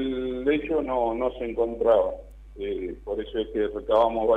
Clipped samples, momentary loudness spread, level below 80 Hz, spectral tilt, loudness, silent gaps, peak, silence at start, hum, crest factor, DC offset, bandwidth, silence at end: under 0.1%; 11 LU; -44 dBFS; -7.5 dB/octave; -26 LUFS; none; -10 dBFS; 0 s; none; 16 dB; under 0.1%; 4.5 kHz; 0 s